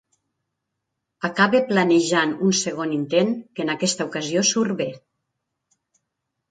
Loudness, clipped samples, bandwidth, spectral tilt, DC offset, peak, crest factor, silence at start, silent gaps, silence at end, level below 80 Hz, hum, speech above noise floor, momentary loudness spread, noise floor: -21 LUFS; under 0.1%; 9.4 kHz; -3.5 dB/octave; under 0.1%; -2 dBFS; 20 dB; 1.2 s; none; 1.55 s; -68 dBFS; none; 59 dB; 9 LU; -80 dBFS